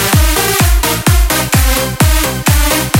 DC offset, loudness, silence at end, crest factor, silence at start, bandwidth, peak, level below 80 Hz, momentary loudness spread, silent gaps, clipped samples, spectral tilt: under 0.1%; -11 LUFS; 0 s; 10 dB; 0 s; 17 kHz; 0 dBFS; -14 dBFS; 2 LU; none; under 0.1%; -3.5 dB/octave